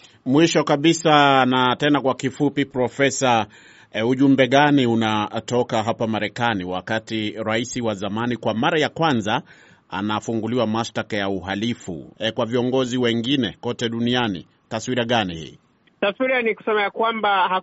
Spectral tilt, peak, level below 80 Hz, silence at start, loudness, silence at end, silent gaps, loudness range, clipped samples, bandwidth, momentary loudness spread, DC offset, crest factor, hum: -3.5 dB/octave; -2 dBFS; -58 dBFS; 0.25 s; -21 LUFS; 0 s; none; 5 LU; under 0.1%; 8 kHz; 10 LU; under 0.1%; 20 dB; none